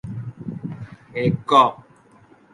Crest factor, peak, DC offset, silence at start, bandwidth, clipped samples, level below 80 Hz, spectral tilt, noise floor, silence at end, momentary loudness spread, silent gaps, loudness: 22 dB; 0 dBFS; under 0.1%; 0.05 s; 10 kHz; under 0.1%; -54 dBFS; -6.5 dB/octave; -52 dBFS; 0.75 s; 18 LU; none; -19 LUFS